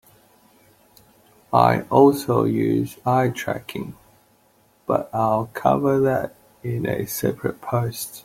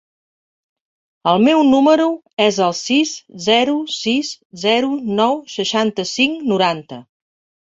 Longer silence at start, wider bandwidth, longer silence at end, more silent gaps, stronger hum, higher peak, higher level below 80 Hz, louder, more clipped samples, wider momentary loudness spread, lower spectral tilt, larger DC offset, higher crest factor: first, 1.5 s vs 1.25 s; first, 16.5 kHz vs 7.8 kHz; second, 0.05 s vs 0.65 s; second, none vs 2.33-2.37 s, 4.45-4.50 s; neither; about the same, -2 dBFS vs -2 dBFS; about the same, -56 dBFS vs -60 dBFS; second, -21 LUFS vs -16 LUFS; neither; first, 13 LU vs 10 LU; first, -6.5 dB/octave vs -4 dB/octave; neither; about the same, 20 dB vs 16 dB